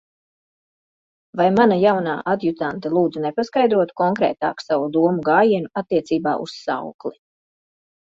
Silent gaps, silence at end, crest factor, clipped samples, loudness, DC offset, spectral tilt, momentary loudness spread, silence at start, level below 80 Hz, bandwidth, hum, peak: 6.94-6.99 s; 1.1 s; 18 dB; under 0.1%; -19 LUFS; under 0.1%; -7 dB/octave; 11 LU; 1.35 s; -62 dBFS; 7.8 kHz; none; -2 dBFS